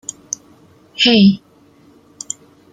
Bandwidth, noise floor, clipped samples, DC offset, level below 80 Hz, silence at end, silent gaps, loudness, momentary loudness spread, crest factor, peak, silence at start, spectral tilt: 9.4 kHz; -49 dBFS; under 0.1%; under 0.1%; -56 dBFS; 1.35 s; none; -13 LUFS; 22 LU; 18 dB; -2 dBFS; 1 s; -4 dB/octave